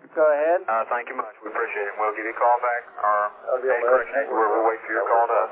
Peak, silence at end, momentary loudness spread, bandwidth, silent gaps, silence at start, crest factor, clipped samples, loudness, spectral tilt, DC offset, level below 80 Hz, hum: -6 dBFS; 0 s; 7 LU; 3.8 kHz; none; 0.05 s; 16 dB; under 0.1%; -23 LUFS; -7 dB/octave; under 0.1%; -74 dBFS; none